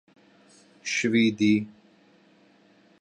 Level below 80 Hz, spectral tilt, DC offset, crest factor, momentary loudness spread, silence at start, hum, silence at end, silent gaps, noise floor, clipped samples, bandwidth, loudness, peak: -68 dBFS; -4.5 dB/octave; under 0.1%; 18 dB; 15 LU; 0.85 s; none; 1.3 s; none; -59 dBFS; under 0.1%; 9.6 kHz; -24 LUFS; -10 dBFS